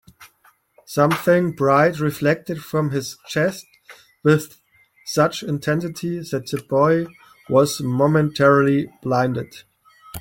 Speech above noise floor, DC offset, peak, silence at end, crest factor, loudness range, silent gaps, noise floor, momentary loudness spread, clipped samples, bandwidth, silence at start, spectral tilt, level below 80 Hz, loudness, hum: 39 dB; under 0.1%; -2 dBFS; 0 s; 18 dB; 4 LU; none; -58 dBFS; 11 LU; under 0.1%; 17 kHz; 0.2 s; -6 dB/octave; -56 dBFS; -20 LUFS; none